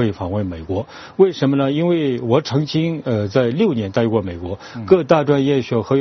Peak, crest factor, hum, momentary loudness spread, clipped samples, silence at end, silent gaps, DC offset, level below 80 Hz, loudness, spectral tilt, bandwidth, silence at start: 0 dBFS; 18 dB; none; 11 LU; under 0.1%; 0 s; none; under 0.1%; -48 dBFS; -18 LUFS; -6.5 dB/octave; 6.4 kHz; 0 s